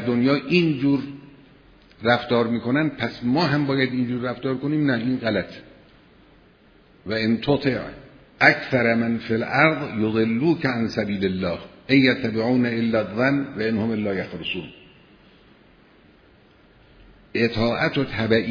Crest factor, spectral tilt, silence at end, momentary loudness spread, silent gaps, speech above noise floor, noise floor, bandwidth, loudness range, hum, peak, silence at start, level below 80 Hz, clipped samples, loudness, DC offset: 22 dB; -7.5 dB/octave; 0 s; 10 LU; none; 32 dB; -54 dBFS; 5.4 kHz; 8 LU; none; 0 dBFS; 0 s; -52 dBFS; under 0.1%; -22 LUFS; under 0.1%